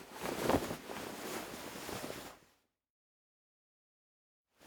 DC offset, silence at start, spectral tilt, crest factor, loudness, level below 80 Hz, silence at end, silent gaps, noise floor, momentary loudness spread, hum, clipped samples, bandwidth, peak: under 0.1%; 0 s; -4 dB/octave; 30 dB; -40 LUFS; -64 dBFS; 0 s; 2.90-4.45 s; -73 dBFS; 11 LU; none; under 0.1%; over 20 kHz; -14 dBFS